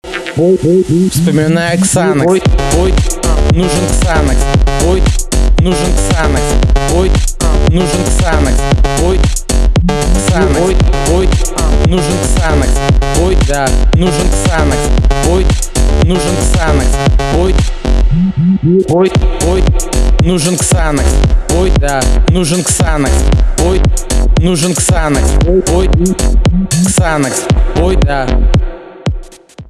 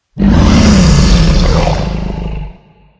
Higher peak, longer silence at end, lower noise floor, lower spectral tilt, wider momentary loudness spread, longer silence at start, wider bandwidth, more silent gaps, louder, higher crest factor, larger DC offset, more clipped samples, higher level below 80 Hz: about the same, 0 dBFS vs 0 dBFS; second, 0.05 s vs 0.5 s; second, -30 dBFS vs -38 dBFS; about the same, -5 dB/octave vs -6 dB/octave; second, 3 LU vs 15 LU; about the same, 0.05 s vs 0.15 s; first, 13.5 kHz vs 8 kHz; neither; about the same, -11 LUFS vs -10 LUFS; about the same, 8 dB vs 10 dB; neither; second, under 0.1% vs 1%; about the same, -12 dBFS vs -14 dBFS